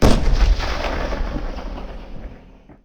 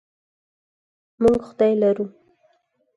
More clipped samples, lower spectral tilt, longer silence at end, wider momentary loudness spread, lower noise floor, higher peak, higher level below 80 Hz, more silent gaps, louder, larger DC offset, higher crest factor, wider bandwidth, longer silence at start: neither; second, -5.5 dB/octave vs -8 dB/octave; second, 0.1 s vs 0.9 s; first, 18 LU vs 8 LU; second, -44 dBFS vs -66 dBFS; first, 0 dBFS vs -6 dBFS; first, -20 dBFS vs -52 dBFS; neither; second, -23 LUFS vs -20 LUFS; neither; about the same, 18 dB vs 18 dB; first, 15 kHz vs 11 kHz; second, 0 s vs 1.2 s